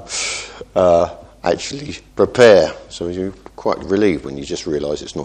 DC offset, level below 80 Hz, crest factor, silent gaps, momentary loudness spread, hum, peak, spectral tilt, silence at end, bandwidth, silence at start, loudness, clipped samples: under 0.1%; -44 dBFS; 18 dB; none; 16 LU; none; 0 dBFS; -4.5 dB/octave; 0 s; 10 kHz; 0 s; -17 LUFS; under 0.1%